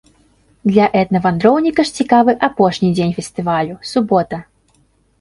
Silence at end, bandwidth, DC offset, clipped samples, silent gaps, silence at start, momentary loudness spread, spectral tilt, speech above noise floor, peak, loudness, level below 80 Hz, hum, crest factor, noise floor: 0.8 s; 11.5 kHz; under 0.1%; under 0.1%; none; 0.65 s; 7 LU; -6.5 dB/octave; 43 dB; 0 dBFS; -15 LUFS; -50 dBFS; none; 16 dB; -57 dBFS